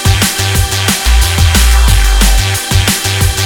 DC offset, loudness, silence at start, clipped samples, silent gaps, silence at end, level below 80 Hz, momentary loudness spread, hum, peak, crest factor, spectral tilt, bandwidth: under 0.1%; -10 LUFS; 0 s; 0.2%; none; 0 s; -12 dBFS; 3 LU; none; 0 dBFS; 8 dB; -3 dB/octave; 19 kHz